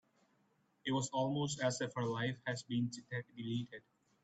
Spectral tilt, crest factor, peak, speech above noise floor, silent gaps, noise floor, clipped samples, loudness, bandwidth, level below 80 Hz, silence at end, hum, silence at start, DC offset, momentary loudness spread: -5 dB/octave; 18 dB; -22 dBFS; 37 dB; none; -76 dBFS; under 0.1%; -39 LUFS; 9 kHz; -78 dBFS; 0.45 s; none; 0.85 s; under 0.1%; 9 LU